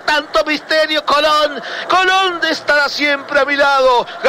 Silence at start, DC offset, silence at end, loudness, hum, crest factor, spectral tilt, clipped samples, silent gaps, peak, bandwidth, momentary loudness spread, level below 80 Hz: 0 s; under 0.1%; 0 s; -13 LUFS; none; 10 dB; -1.5 dB/octave; under 0.1%; none; -4 dBFS; 16 kHz; 5 LU; -48 dBFS